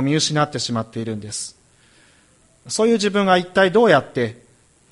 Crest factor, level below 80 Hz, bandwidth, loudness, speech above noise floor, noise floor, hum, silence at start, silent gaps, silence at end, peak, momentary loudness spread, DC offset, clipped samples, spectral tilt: 20 dB; -58 dBFS; 11.5 kHz; -19 LUFS; 37 dB; -55 dBFS; none; 0 s; none; 0.6 s; 0 dBFS; 13 LU; under 0.1%; under 0.1%; -4.5 dB/octave